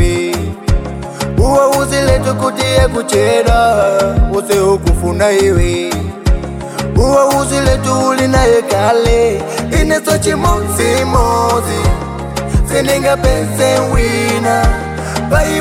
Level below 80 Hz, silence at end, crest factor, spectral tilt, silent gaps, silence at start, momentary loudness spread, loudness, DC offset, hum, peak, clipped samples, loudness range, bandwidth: -20 dBFS; 0 s; 12 dB; -5 dB/octave; none; 0 s; 8 LU; -13 LUFS; under 0.1%; none; 0 dBFS; under 0.1%; 2 LU; 16.5 kHz